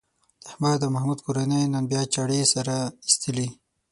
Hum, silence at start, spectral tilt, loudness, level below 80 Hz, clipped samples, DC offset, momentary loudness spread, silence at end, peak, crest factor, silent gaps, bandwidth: none; 0.45 s; -4.5 dB/octave; -24 LUFS; -62 dBFS; under 0.1%; under 0.1%; 7 LU; 0.4 s; -2 dBFS; 24 dB; none; 11.5 kHz